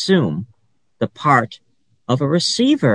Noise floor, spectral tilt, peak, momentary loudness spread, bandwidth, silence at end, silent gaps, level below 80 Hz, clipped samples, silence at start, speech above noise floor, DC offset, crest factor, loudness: -63 dBFS; -5 dB/octave; -2 dBFS; 15 LU; 10.5 kHz; 0 s; none; -60 dBFS; under 0.1%; 0 s; 47 dB; under 0.1%; 16 dB; -18 LUFS